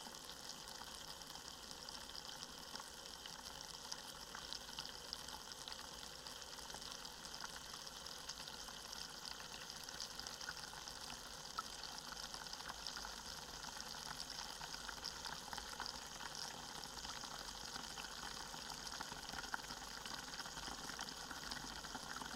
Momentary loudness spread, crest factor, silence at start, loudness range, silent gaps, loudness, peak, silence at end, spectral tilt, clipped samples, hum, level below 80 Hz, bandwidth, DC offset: 3 LU; 26 dB; 0 s; 2 LU; none; -48 LUFS; -26 dBFS; 0 s; -1 dB/octave; under 0.1%; none; -66 dBFS; 16.5 kHz; under 0.1%